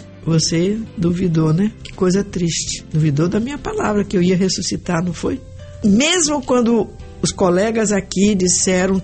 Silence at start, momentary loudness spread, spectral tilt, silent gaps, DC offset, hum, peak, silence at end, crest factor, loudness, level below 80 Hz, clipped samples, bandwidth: 0 s; 8 LU; -4.5 dB/octave; none; under 0.1%; none; -2 dBFS; 0 s; 14 dB; -17 LUFS; -40 dBFS; under 0.1%; 8.8 kHz